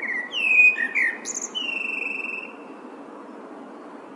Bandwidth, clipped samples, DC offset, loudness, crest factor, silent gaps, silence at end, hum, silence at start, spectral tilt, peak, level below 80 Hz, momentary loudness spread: 11.5 kHz; under 0.1%; under 0.1%; -20 LUFS; 18 dB; none; 0 s; none; 0 s; 0.5 dB/octave; -8 dBFS; under -90 dBFS; 26 LU